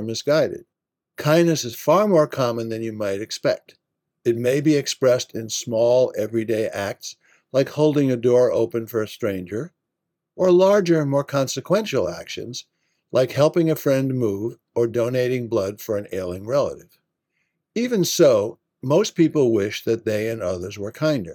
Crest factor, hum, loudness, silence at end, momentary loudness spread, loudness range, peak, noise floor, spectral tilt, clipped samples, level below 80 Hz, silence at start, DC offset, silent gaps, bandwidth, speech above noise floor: 18 dB; none; -21 LUFS; 0 s; 12 LU; 2 LU; -4 dBFS; -81 dBFS; -5.5 dB/octave; under 0.1%; -68 dBFS; 0 s; under 0.1%; none; 18 kHz; 61 dB